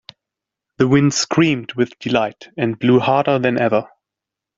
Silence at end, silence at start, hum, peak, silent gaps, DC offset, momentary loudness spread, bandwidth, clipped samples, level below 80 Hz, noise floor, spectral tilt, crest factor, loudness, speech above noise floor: 0.7 s; 0.8 s; none; -2 dBFS; none; under 0.1%; 8 LU; 7.8 kHz; under 0.1%; -56 dBFS; -85 dBFS; -5.5 dB/octave; 16 dB; -17 LUFS; 68 dB